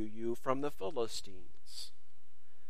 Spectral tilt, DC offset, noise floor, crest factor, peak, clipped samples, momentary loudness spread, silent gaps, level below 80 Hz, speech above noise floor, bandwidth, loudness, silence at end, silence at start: -4.5 dB/octave; 2%; -73 dBFS; 24 dB; -16 dBFS; under 0.1%; 16 LU; none; -66 dBFS; 33 dB; 15.5 kHz; -40 LUFS; 0.8 s; 0 s